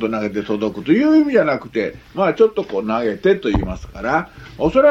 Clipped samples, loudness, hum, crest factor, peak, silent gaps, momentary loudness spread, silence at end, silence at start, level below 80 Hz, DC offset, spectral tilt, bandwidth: under 0.1%; -18 LUFS; none; 16 dB; -2 dBFS; none; 10 LU; 0 s; 0 s; -36 dBFS; under 0.1%; -7.5 dB/octave; 7.4 kHz